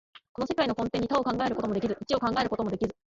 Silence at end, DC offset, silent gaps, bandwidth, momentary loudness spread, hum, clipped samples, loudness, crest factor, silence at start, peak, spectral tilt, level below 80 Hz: 0.15 s; under 0.1%; 0.29-0.35 s; 7.8 kHz; 4 LU; none; under 0.1%; -29 LUFS; 16 dB; 0.15 s; -14 dBFS; -6 dB/octave; -54 dBFS